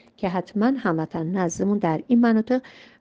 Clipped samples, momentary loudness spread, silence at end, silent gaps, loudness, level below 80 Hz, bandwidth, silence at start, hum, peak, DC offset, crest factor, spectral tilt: under 0.1%; 8 LU; 0.3 s; none; -23 LUFS; -60 dBFS; 8 kHz; 0.2 s; none; -8 dBFS; under 0.1%; 14 dB; -6.5 dB/octave